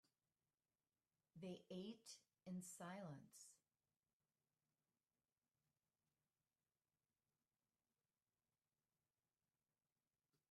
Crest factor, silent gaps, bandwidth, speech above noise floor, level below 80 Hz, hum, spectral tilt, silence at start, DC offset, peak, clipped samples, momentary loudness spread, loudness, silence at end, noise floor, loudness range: 20 dB; none; 13 kHz; over 33 dB; under -90 dBFS; none; -5 dB/octave; 1.35 s; under 0.1%; -44 dBFS; under 0.1%; 9 LU; -58 LUFS; 6.95 s; under -90 dBFS; 5 LU